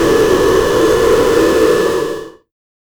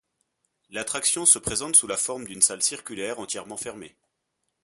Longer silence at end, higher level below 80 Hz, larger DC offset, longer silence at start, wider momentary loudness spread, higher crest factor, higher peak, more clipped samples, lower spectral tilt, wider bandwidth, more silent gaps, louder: about the same, 0.65 s vs 0.75 s; first, -32 dBFS vs -58 dBFS; neither; second, 0 s vs 0.7 s; second, 7 LU vs 16 LU; second, 10 dB vs 26 dB; about the same, -2 dBFS vs -2 dBFS; neither; first, -4.5 dB/octave vs -0.5 dB/octave; first, over 20 kHz vs 12 kHz; neither; first, -12 LUFS vs -22 LUFS